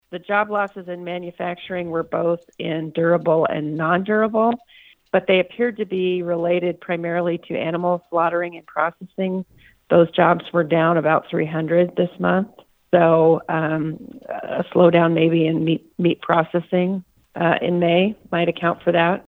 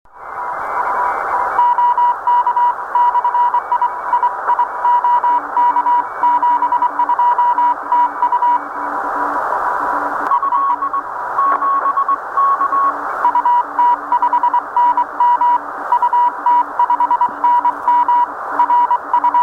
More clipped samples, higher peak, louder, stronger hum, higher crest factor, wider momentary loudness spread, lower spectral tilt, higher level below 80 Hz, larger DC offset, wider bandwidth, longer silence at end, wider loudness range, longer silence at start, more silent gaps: neither; first, 0 dBFS vs -4 dBFS; second, -20 LUFS vs -15 LUFS; neither; first, 20 dB vs 12 dB; first, 11 LU vs 5 LU; first, -9 dB/octave vs -4 dB/octave; second, -64 dBFS vs -58 dBFS; neither; second, 4.2 kHz vs 5.2 kHz; about the same, 0.05 s vs 0 s; about the same, 4 LU vs 2 LU; about the same, 0.1 s vs 0.15 s; neither